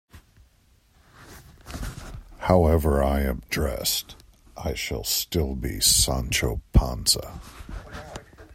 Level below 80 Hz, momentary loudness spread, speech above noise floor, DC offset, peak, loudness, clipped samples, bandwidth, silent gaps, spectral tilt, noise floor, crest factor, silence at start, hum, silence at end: -32 dBFS; 22 LU; 36 dB; under 0.1%; -4 dBFS; -23 LUFS; under 0.1%; 16 kHz; none; -3.5 dB/octave; -60 dBFS; 22 dB; 0.15 s; none; 0 s